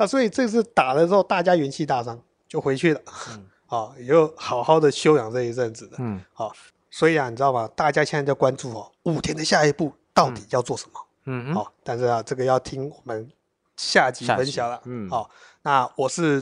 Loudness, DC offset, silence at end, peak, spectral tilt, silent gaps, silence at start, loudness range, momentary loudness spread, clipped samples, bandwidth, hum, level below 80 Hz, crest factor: -22 LUFS; under 0.1%; 0 s; -2 dBFS; -5 dB/octave; none; 0 s; 3 LU; 14 LU; under 0.1%; 11 kHz; none; -60 dBFS; 20 dB